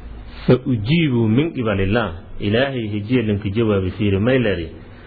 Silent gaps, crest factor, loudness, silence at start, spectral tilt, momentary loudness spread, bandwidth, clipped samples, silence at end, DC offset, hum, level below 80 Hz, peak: none; 16 dB; -19 LUFS; 0 s; -10.5 dB/octave; 9 LU; 4.9 kHz; under 0.1%; 0 s; under 0.1%; none; -38 dBFS; -2 dBFS